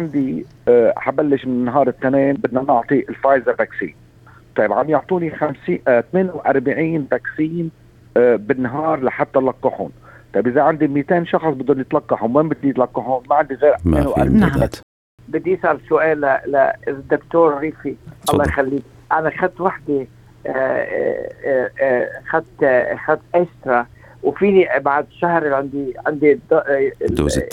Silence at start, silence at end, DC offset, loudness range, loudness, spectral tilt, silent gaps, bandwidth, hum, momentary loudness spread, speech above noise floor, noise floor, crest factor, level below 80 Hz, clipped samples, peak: 0 s; 0 s; under 0.1%; 3 LU; -18 LUFS; -7 dB/octave; 14.83-15.18 s; 15 kHz; none; 8 LU; 29 dB; -46 dBFS; 16 dB; -40 dBFS; under 0.1%; -2 dBFS